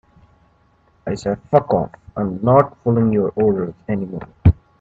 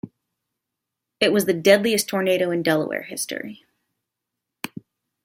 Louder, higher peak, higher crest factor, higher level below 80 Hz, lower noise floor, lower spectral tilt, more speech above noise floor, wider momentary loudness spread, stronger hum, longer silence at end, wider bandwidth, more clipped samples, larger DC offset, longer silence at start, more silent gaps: about the same, -19 LUFS vs -21 LUFS; about the same, 0 dBFS vs -2 dBFS; about the same, 18 dB vs 22 dB; first, -38 dBFS vs -68 dBFS; second, -57 dBFS vs -83 dBFS; first, -9.5 dB/octave vs -4 dB/octave; second, 39 dB vs 63 dB; second, 11 LU vs 18 LU; neither; second, 0.3 s vs 0.55 s; second, 7.8 kHz vs 16 kHz; neither; neither; first, 1.05 s vs 0.05 s; neither